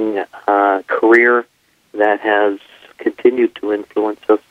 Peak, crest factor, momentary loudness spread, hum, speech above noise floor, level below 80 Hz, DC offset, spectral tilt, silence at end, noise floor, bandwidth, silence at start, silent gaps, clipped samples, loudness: 0 dBFS; 16 dB; 12 LU; none; 24 dB; -66 dBFS; under 0.1%; -5.5 dB/octave; 0.1 s; -38 dBFS; 6.2 kHz; 0 s; none; under 0.1%; -15 LUFS